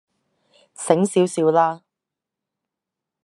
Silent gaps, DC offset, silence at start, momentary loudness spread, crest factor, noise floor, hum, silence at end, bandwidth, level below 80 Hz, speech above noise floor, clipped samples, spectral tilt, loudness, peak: none; under 0.1%; 0.8 s; 13 LU; 22 dB; -85 dBFS; none; 1.45 s; 12 kHz; -72 dBFS; 67 dB; under 0.1%; -5.5 dB/octave; -19 LUFS; -2 dBFS